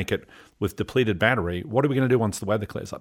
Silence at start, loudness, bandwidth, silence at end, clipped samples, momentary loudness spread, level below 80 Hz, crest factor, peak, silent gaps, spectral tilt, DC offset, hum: 0 s; -24 LUFS; 18.5 kHz; 0 s; under 0.1%; 10 LU; -50 dBFS; 20 dB; -4 dBFS; none; -6 dB/octave; under 0.1%; none